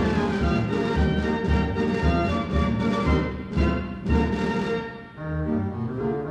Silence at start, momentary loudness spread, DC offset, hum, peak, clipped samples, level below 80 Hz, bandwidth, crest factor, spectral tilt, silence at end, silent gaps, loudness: 0 s; 6 LU; under 0.1%; none; -10 dBFS; under 0.1%; -32 dBFS; 8.8 kHz; 14 dB; -7.5 dB/octave; 0 s; none; -25 LUFS